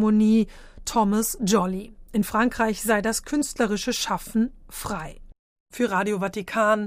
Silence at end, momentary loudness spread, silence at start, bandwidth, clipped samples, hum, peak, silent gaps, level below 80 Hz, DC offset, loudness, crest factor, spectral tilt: 0 s; 10 LU; 0 s; 16 kHz; under 0.1%; none; -8 dBFS; 5.39-5.66 s; -46 dBFS; under 0.1%; -24 LUFS; 16 dB; -4.5 dB/octave